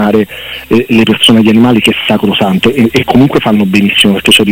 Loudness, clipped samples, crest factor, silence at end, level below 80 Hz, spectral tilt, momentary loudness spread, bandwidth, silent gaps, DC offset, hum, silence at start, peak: -7 LUFS; 0.3%; 8 dB; 0 s; -38 dBFS; -5 dB/octave; 6 LU; 17 kHz; none; under 0.1%; none; 0 s; 0 dBFS